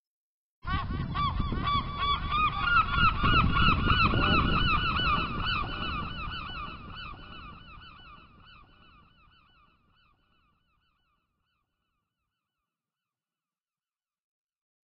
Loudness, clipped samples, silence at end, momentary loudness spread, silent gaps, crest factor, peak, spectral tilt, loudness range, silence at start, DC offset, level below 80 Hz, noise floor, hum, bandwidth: -27 LUFS; under 0.1%; 6.8 s; 21 LU; none; 22 dB; -10 dBFS; -3 dB/octave; 19 LU; 0.65 s; under 0.1%; -38 dBFS; under -90 dBFS; none; 5.6 kHz